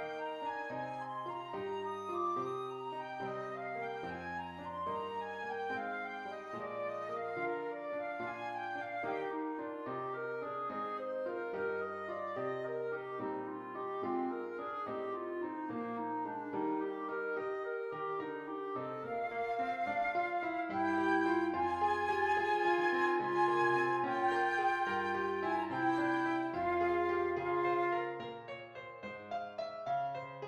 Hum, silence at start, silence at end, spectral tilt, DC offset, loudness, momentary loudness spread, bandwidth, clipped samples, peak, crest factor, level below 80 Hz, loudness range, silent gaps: none; 0 s; 0 s; -6 dB/octave; under 0.1%; -37 LUFS; 10 LU; 9.8 kHz; under 0.1%; -20 dBFS; 16 dB; -74 dBFS; 8 LU; none